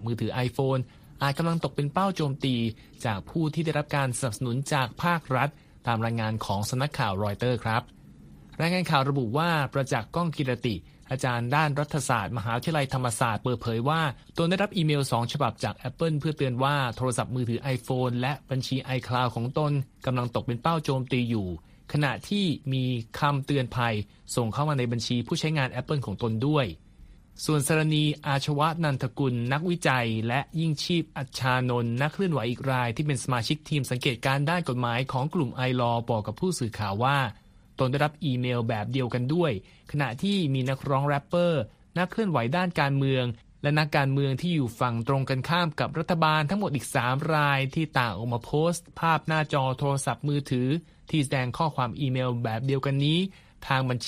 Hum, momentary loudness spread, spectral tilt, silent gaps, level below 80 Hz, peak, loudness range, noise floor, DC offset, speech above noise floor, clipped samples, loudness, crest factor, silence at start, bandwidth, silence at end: none; 5 LU; -6 dB/octave; none; -54 dBFS; -6 dBFS; 2 LU; -51 dBFS; under 0.1%; 24 dB; under 0.1%; -27 LUFS; 20 dB; 0 s; 15.5 kHz; 0 s